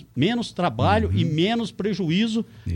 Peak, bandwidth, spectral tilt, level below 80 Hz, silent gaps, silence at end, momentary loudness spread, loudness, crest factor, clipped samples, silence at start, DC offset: -8 dBFS; 11 kHz; -6.5 dB/octave; -44 dBFS; none; 0 s; 5 LU; -23 LUFS; 14 dB; under 0.1%; 0 s; under 0.1%